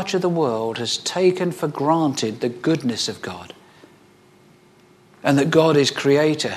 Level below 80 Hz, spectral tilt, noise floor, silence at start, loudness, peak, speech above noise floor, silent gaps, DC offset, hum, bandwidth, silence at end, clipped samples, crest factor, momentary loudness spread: -66 dBFS; -5 dB/octave; -52 dBFS; 0 s; -20 LUFS; -2 dBFS; 33 dB; none; under 0.1%; none; 14 kHz; 0 s; under 0.1%; 20 dB; 9 LU